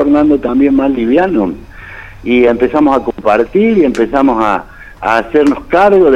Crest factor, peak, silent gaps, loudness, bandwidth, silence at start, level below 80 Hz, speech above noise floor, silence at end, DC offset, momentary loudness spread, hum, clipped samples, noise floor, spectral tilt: 10 dB; 0 dBFS; none; -11 LUFS; 8.8 kHz; 0 s; -36 dBFS; 20 dB; 0 s; under 0.1%; 10 LU; none; under 0.1%; -30 dBFS; -7 dB/octave